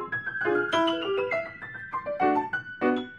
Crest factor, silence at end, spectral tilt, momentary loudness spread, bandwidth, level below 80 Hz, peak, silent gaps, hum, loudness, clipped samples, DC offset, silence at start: 16 dB; 0 s; -5 dB/octave; 9 LU; 11 kHz; -66 dBFS; -12 dBFS; none; none; -27 LUFS; under 0.1%; under 0.1%; 0 s